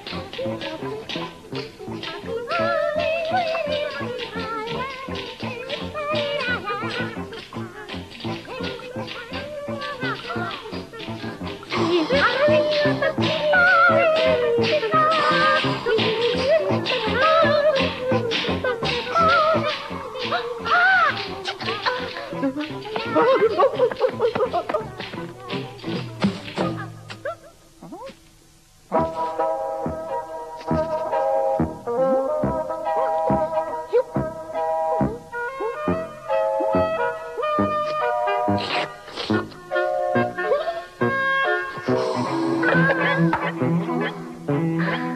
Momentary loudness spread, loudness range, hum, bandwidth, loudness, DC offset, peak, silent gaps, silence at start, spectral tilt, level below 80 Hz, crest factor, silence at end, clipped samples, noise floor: 14 LU; 11 LU; none; 13.5 kHz; -22 LUFS; under 0.1%; -6 dBFS; none; 0 s; -6 dB/octave; -52 dBFS; 16 dB; 0 s; under 0.1%; -52 dBFS